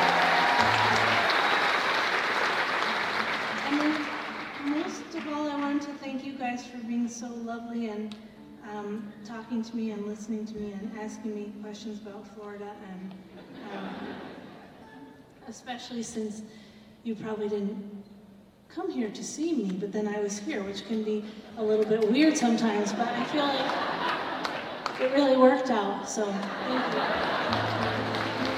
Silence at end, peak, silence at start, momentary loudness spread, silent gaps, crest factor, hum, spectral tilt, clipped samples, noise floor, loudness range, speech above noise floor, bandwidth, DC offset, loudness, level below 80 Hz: 0 s; -8 dBFS; 0 s; 19 LU; none; 22 dB; none; -4 dB/octave; under 0.1%; -53 dBFS; 14 LU; 24 dB; 15 kHz; under 0.1%; -28 LUFS; -64 dBFS